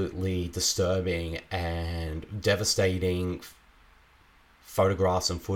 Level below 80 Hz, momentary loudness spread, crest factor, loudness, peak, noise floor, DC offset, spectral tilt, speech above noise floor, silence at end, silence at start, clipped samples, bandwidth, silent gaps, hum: -44 dBFS; 10 LU; 18 dB; -28 LUFS; -12 dBFS; -59 dBFS; under 0.1%; -4 dB/octave; 31 dB; 0 s; 0 s; under 0.1%; 17 kHz; none; none